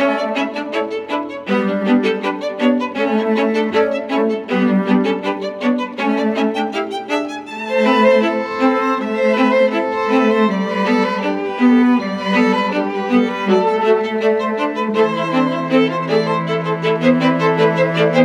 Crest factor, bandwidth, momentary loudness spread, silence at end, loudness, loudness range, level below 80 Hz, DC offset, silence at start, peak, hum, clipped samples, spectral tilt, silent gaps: 14 dB; 9.8 kHz; 7 LU; 0 s; -16 LUFS; 3 LU; -64 dBFS; under 0.1%; 0 s; -2 dBFS; none; under 0.1%; -6.5 dB/octave; none